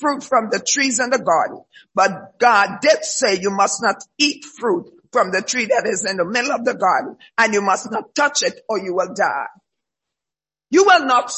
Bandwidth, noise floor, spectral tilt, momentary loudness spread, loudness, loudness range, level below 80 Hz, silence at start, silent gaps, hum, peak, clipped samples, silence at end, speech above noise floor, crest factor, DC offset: 8.6 kHz; -89 dBFS; -2 dB/octave; 8 LU; -18 LUFS; 3 LU; -66 dBFS; 0 s; none; none; 0 dBFS; under 0.1%; 0 s; 71 dB; 18 dB; under 0.1%